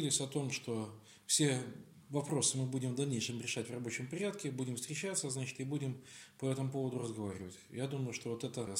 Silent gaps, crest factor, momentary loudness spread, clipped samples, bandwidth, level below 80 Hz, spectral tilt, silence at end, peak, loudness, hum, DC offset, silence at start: none; 20 dB; 11 LU; under 0.1%; 16.5 kHz; -80 dBFS; -4 dB/octave; 0 s; -18 dBFS; -38 LUFS; none; under 0.1%; 0 s